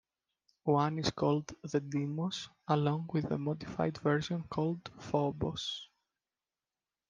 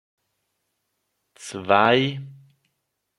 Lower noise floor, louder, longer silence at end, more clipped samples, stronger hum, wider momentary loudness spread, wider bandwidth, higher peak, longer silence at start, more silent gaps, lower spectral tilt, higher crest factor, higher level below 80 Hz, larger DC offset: first, under -90 dBFS vs -77 dBFS; second, -34 LUFS vs -19 LUFS; first, 1.25 s vs 0.85 s; neither; neither; second, 7 LU vs 20 LU; second, 7.6 kHz vs 12 kHz; second, -14 dBFS vs -2 dBFS; second, 0.65 s vs 1.4 s; neither; first, -6.5 dB/octave vs -5 dB/octave; about the same, 20 dB vs 24 dB; about the same, -64 dBFS vs -68 dBFS; neither